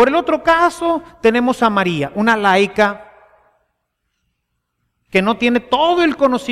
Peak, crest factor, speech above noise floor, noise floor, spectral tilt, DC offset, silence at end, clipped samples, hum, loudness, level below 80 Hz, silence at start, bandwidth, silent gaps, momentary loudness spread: -2 dBFS; 14 dB; 57 dB; -72 dBFS; -5 dB/octave; under 0.1%; 0 s; under 0.1%; none; -15 LUFS; -48 dBFS; 0 s; 14.5 kHz; none; 5 LU